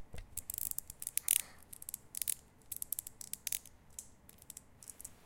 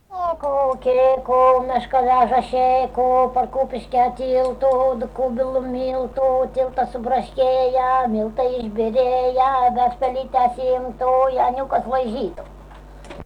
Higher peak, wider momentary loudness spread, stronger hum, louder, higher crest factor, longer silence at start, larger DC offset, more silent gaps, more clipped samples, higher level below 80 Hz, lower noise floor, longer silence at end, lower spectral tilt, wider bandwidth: about the same, -8 dBFS vs -6 dBFS; first, 20 LU vs 7 LU; neither; second, -38 LUFS vs -19 LUFS; first, 36 dB vs 14 dB; about the same, 0 s vs 0.1 s; neither; neither; neither; second, -62 dBFS vs -42 dBFS; first, -59 dBFS vs -40 dBFS; about the same, 0.05 s vs 0 s; second, 0.5 dB/octave vs -6.5 dB/octave; first, 17 kHz vs 9.4 kHz